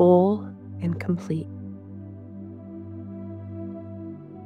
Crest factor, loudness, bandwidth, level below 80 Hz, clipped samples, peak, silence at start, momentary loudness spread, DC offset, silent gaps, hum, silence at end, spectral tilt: 20 dB; -28 LUFS; 6.6 kHz; -70 dBFS; under 0.1%; -6 dBFS; 0 s; 16 LU; under 0.1%; none; none; 0 s; -10 dB/octave